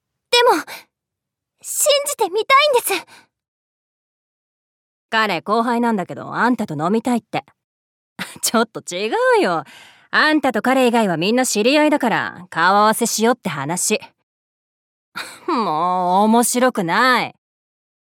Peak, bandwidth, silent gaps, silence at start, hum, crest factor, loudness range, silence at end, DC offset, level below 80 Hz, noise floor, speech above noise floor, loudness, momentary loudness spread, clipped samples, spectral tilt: -2 dBFS; 18 kHz; 3.48-5.09 s, 7.64-8.16 s, 14.23-15.12 s; 0.3 s; none; 16 dB; 5 LU; 0.85 s; under 0.1%; -74 dBFS; -83 dBFS; 65 dB; -17 LUFS; 11 LU; under 0.1%; -3 dB/octave